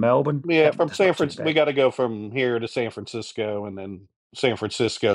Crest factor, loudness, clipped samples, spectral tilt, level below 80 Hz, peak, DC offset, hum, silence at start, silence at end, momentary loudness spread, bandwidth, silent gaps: 16 dB; -23 LUFS; under 0.1%; -5.5 dB/octave; -66 dBFS; -6 dBFS; under 0.1%; none; 0 s; 0 s; 14 LU; 11.5 kHz; 4.16-4.30 s